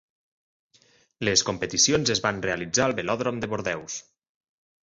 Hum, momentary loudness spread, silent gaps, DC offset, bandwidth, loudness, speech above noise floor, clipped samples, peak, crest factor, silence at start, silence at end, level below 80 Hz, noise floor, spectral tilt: none; 10 LU; none; under 0.1%; 8.2 kHz; -24 LUFS; 36 dB; under 0.1%; -6 dBFS; 22 dB; 1.2 s; 0.85 s; -56 dBFS; -62 dBFS; -2.5 dB/octave